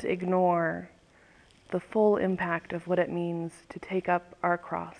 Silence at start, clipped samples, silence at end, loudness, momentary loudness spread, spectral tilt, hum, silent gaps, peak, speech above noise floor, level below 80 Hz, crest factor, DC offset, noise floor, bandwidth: 0 s; under 0.1%; 0.05 s; -29 LUFS; 11 LU; -8 dB/octave; none; none; -12 dBFS; 30 dB; -64 dBFS; 18 dB; under 0.1%; -59 dBFS; 10 kHz